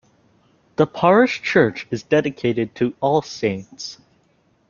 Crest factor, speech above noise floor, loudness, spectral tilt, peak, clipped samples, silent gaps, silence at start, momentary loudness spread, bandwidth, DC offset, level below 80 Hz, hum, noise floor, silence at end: 20 dB; 42 dB; -19 LUFS; -6 dB/octave; -2 dBFS; under 0.1%; none; 0.8 s; 15 LU; 7.2 kHz; under 0.1%; -58 dBFS; none; -61 dBFS; 0.75 s